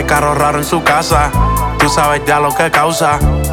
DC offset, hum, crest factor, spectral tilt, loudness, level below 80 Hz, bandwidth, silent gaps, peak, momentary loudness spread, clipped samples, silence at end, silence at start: 0.2%; none; 12 dB; -4.5 dB/octave; -12 LUFS; -20 dBFS; 19 kHz; none; 0 dBFS; 2 LU; under 0.1%; 0 s; 0 s